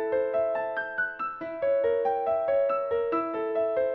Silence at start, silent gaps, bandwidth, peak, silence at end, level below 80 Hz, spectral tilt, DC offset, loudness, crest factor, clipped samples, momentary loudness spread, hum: 0 s; none; 4.7 kHz; -16 dBFS; 0 s; -64 dBFS; -7.5 dB/octave; under 0.1%; -28 LUFS; 12 dB; under 0.1%; 5 LU; none